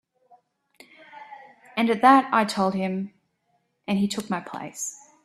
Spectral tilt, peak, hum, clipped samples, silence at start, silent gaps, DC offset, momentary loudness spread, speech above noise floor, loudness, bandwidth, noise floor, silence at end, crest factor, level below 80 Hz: -4.5 dB/octave; -4 dBFS; none; under 0.1%; 1.15 s; none; under 0.1%; 23 LU; 49 dB; -23 LUFS; 14 kHz; -71 dBFS; 0.3 s; 22 dB; -68 dBFS